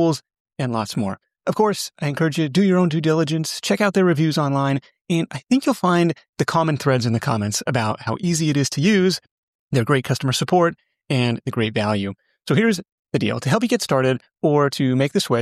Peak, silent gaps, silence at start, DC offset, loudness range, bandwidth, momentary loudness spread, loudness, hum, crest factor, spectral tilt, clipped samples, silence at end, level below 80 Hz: -4 dBFS; 0.40-0.45 s, 5.01-5.05 s, 6.29-6.33 s, 9.31-9.68 s, 12.92-13.03 s; 0 s; under 0.1%; 2 LU; 14.5 kHz; 7 LU; -20 LUFS; none; 16 dB; -5.5 dB/octave; under 0.1%; 0 s; -60 dBFS